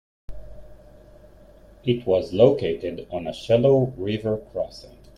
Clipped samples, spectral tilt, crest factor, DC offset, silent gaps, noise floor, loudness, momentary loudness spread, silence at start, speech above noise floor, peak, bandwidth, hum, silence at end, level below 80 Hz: under 0.1%; -8 dB/octave; 20 dB; under 0.1%; none; -49 dBFS; -23 LUFS; 13 LU; 0.3 s; 27 dB; -4 dBFS; 11 kHz; none; 0.3 s; -48 dBFS